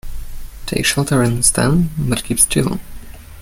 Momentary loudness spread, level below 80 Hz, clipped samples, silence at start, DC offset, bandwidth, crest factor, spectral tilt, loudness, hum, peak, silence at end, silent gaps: 20 LU; -30 dBFS; under 0.1%; 0.05 s; under 0.1%; 17 kHz; 18 dB; -4 dB/octave; -15 LUFS; none; 0 dBFS; 0 s; none